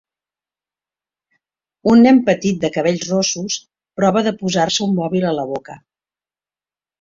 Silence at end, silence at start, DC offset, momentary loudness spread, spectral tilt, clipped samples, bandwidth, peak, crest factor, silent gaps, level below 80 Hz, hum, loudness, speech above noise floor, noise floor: 1.25 s; 1.85 s; under 0.1%; 13 LU; -5 dB/octave; under 0.1%; 7.6 kHz; -2 dBFS; 16 dB; none; -56 dBFS; none; -16 LUFS; over 74 dB; under -90 dBFS